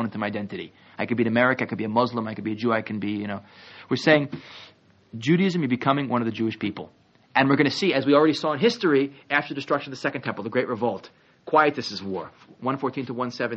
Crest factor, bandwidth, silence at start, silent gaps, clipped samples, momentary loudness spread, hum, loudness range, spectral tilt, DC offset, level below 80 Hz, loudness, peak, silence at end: 20 dB; 7.6 kHz; 0 s; none; under 0.1%; 15 LU; none; 4 LU; -4 dB/octave; under 0.1%; -68 dBFS; -24 LUFS; -4 dBFS; 0 s